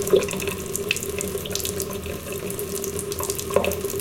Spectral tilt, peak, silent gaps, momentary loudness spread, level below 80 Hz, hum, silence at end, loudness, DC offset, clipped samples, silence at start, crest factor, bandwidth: -3.5 dB/octave; -4 dBFS; none; 6 LU; -46 dBFS; none; 0 s; -26 LUFS; under 0.1%; under 0.1%; 0 s; 22 dB; 17 kHz